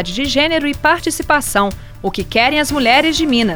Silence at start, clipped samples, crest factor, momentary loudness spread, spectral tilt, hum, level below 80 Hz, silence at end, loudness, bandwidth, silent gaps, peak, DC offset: 0 s; under 0.1%; 14 dB; 8 LU; -3 dB/octave; none; -34 dBFS; 0 s; -14 LUFS; over 20 kHz; none; 0 dBFS; under 0.1%